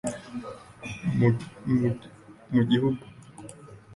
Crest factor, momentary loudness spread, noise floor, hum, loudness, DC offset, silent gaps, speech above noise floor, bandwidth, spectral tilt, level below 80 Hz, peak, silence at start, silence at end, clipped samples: 20 dB; 21 LU; -46 dBFS; none; -27 LUFS; under 0.1%; none; 22 dB; 11.5 kHz; -7 dB/octave; -56 dBFS; -8 dBFS; 0.05 s; 0 s; under 0.1%